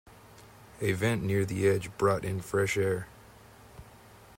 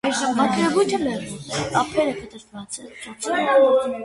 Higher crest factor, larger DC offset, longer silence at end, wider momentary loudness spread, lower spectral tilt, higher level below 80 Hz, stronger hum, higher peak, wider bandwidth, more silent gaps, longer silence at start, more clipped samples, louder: about the same, 18 dB vs 18 dB; neither; first, 0.5 s vs 0 s; second, 6 LU vs 17 LU; first, -6 dB/octave vs -4 dB/octave; about the same, -58 dBFS vs -56 dBFS; neither; second, -14 dBFS vs -4 dBFS; first, 16 kHz vs 11.5 kHz; neither; first, 0.3 s vs 0.05 s; neither; second, -29 LUFS vs -21 LUFS